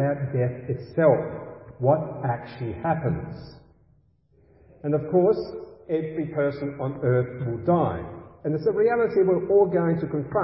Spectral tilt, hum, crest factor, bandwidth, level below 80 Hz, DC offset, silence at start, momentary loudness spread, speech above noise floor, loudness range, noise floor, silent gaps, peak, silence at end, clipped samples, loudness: -13 dB/octave; none; 18 dB; 5.8 kHz; -52 dBFS; under 0.1%; 0 s; 14 LU; 38 dB; 6 LU; -61 dBFS; none; -6 dBFS; 0 s; under 0.1%; -25 LUFS